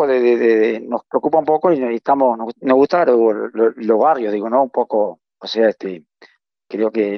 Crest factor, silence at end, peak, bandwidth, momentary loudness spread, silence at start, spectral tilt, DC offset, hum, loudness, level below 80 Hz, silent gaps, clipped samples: 16 dB; 0 s; 0 dBFS; 6.2 kHz; 10 LU; 0 s; -7 dB/octave; under 0.1%; none; -16 LUFS; -68 dBFS; none; under 0.1%